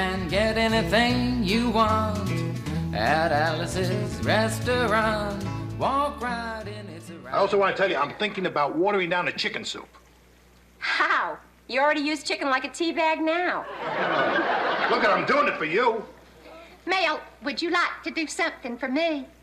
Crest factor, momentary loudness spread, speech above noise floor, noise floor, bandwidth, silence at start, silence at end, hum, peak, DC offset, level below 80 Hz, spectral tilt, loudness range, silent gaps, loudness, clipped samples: 16 dB; 10 LU; 30 dB; -55 dBFS; 15.5 kHz; 0 s; 0.15 s; none; -10 dBFS; under 0.1%; -46 dBFS; -5 dB/octave; 3 LU; none; -24 LUFS; under 0.1%